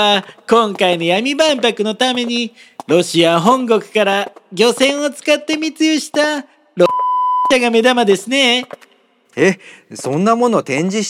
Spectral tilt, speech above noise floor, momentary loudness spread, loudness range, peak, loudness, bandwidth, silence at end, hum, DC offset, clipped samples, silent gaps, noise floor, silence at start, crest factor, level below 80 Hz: -4 dB/octave; 38 dB; 9 LU; 1 LU; 0 dBFS; -14 LUFS; 15.5 kHz; 0 s; none; under 0.1%; under 0.1%; none; -53 dBFS; 0 s; 14 dB; -62 dBFS